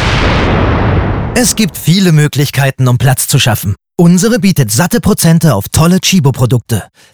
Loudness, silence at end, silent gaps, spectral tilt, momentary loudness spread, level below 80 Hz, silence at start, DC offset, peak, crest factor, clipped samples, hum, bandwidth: -10 LUFS; 0.3 s; none; -5 dB/octave; 5 LU; -24 dBFS; 0 s; under 0.1%; 0 dBFS; 10 dB; under 0.1%; none; over 20 kHz